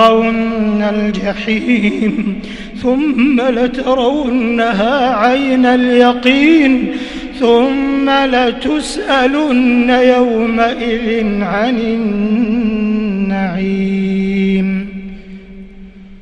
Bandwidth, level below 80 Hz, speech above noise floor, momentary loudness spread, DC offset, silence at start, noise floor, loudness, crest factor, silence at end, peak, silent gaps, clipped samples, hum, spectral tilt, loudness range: 11 kHz; -36 dBFS; 22 dB; 8 LU; under 0.1%; 0 s; -34 dBFS; -13 LUFS; 12 dB; 0.05 s; 0 dBFS; none; under 0.1%; none; -6 dB/octave; 4 LU